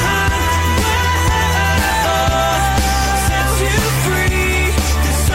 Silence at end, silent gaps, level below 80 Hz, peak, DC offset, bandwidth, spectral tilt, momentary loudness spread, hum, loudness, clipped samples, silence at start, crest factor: 0 s; none; -20 dBFS; -4 dBFS; under 0.1%; 16.5 kHz; -4 dB/octave; 1 LU; none; -15 LUFS; under 0.1%; 0 s; 10 dB